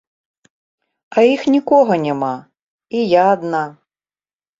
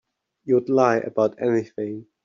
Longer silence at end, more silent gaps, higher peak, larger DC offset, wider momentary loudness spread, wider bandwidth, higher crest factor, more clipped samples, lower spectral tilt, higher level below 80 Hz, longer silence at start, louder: first, 0.9 s vs 0.25 s; first, 2.62-2.78 s vs none; about the same, -2 dBFS vs -4 dBFS; neither; about the same, 11 LU vs 12 LU; about the same, 7.8 kHz vs 7.4 kHz; about the same, 16 dB vs 18 dB; neither; about the same, -6.5 dB/octave vs -6.5 dB/octave; about the same, -64 dBFS vs -68 dBFS; first, 1.1 s vs 0.45 s; first, -16 LUFS vs -22 LUFS